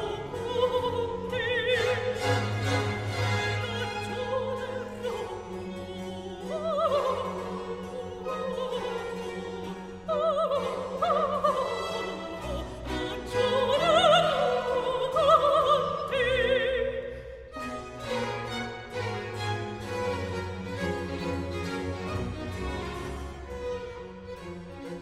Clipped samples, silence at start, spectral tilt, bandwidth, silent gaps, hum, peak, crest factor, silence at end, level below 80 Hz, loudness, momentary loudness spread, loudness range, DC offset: under 0.1%; 0 s; -5 dB/octave; 14.5 kHz; none; none; -8 dBFS; 20 dB; 0 s; -48 dBFS; -29 LUFS; 13 LU; 10 LU; under 0.1%